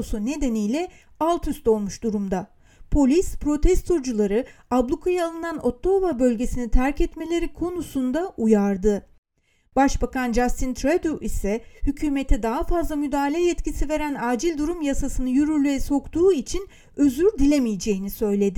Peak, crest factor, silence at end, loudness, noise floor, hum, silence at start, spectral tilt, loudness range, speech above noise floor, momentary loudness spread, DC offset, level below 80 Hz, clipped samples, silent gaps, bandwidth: -4 dBFS; 18 dB; 0 s; -23 LUFS; -65 dBFS; none; 0 s; -6 dB/octave; 3 LU; 43 dB; 7 LU; under 0.1%; -30 dBFS; under 0.1%; 9.18-9.23 s; 17.5 kHz